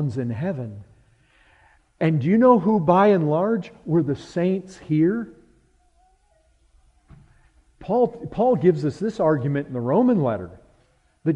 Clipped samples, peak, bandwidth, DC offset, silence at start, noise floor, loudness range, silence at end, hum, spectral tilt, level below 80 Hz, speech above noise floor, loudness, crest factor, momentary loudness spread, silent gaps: under 0.1%; -4 dBFS; 8.8 kHz; under 0.1%; 0 s; -61 dBFS; 9 LU; 0 s; none; -9 dB/octave; -56 dBFS; 41 dB; -21 LUFS; 20 dB; 12 LU; none